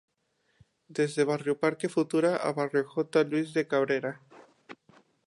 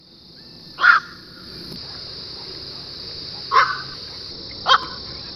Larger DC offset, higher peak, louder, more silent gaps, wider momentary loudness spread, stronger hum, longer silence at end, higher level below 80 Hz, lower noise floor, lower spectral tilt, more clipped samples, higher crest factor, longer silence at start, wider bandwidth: neither; second, -12 dBFS vs -2 dBFS; second, -28 LUFS vs -21 LUFS; neither; second, 5 LU vs 22 LU; neither; first, 0.55 s vs 0 s; second, -80 dBFS vs -52 dBFS; first, -74 dBFS vs -45 dBFS; first, -6 dB/octave vs -2.5 dB/octave; neither; about the same, 18 dB vs 22 dB; about the same, 0.9 s vs 0.8 s; second, 11.5 kHz vs 13.5 kHz